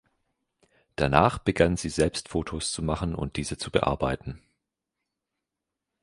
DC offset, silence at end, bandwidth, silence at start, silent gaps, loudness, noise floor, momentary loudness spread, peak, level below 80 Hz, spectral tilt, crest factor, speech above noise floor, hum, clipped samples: under 0.1%; 1.65 s; 11.5 kHz; 1 s; none; -27 LUFS; -86 dBFS; 11 LU; -2 dBFS; -42 dBFS; -5 dB/octave; 26 dB; 60 dB; none; under 0.1%